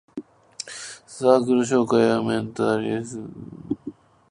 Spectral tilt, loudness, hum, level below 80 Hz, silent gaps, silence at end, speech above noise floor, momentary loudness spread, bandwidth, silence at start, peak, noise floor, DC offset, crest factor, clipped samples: -5.5 dB/octave; -22 LUFS; none; -60 dBFS; none; 0.4 s; 19 dB; 20 LU; 11 kHz; 0.15 s; -2 dBFS; -41 dBFS; under 0.1%; 22 dB; under 0.1%